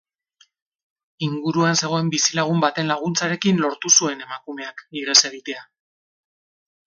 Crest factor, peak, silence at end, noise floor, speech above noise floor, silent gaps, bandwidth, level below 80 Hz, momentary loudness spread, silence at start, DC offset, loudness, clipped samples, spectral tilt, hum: 22 dB; 0 dBFS; 1.35 s; -60 dBFS; 39 dB; none; 16 kHz; -70 dBFS; 17 LU; 1.2 s; under 0.1%; -19 LUFS; under 0.1%; -2.5 dB/octave; none